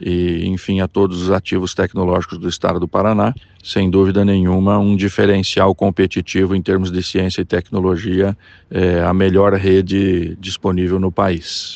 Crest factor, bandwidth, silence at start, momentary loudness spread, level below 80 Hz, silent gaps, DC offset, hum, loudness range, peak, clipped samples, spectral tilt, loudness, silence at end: 14 dB; 8.4 kHz; 0 s; 6 LU; -40 dBFS; none; under 0.1%; none; 3 LU; 0 dBFS; under 0.1%; -6.5 dB/octave; -16 LUFS; 0 s